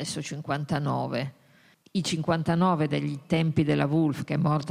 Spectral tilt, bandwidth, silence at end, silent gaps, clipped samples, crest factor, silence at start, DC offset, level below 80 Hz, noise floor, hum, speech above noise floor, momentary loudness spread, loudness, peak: -6.5 dB/octave; 13 kHz; 0 s; none; under 0.1%; 18 dB; 0 s; under 0.1%; -60 dBFS; -59 dBFS; none; 33 dB; 9 LU; -27 LUFS; -8 dBFS